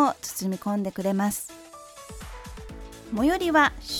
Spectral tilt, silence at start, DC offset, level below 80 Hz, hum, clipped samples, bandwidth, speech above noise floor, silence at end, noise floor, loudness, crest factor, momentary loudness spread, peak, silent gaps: -4.5 dB/octave; 0 s; under 0.1%; -46 dBFS; none; under 0.1%; over 20 kHz; 20 dB; 0 s; -45 dBFS; -25 LUFS; 20 dB; 22 LU; -8 dBFS; none